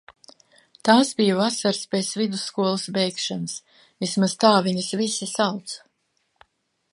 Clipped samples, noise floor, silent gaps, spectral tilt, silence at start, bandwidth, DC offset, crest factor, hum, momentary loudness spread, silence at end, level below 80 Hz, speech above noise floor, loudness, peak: under 0.1%; -71 dBFS; none; -4 dB/octave; 0.85 s; 11.5 kHz; under 0.1%; 22 dB; none; 13 LU; 1.15 s; -72 dBFS; 49 dB; -22 LUFS; -2 dBFS